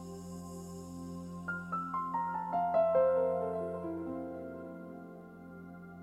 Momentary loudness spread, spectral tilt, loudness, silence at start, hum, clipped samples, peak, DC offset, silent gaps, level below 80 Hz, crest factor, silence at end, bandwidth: 21 LU; -7.5 dB/octave; -35 LUFS; 0 s; none; under 0.1%; -18 dBFS; under 0.1%; none; -70 dBFS; 18 dB; 0 s; 13.5 kHz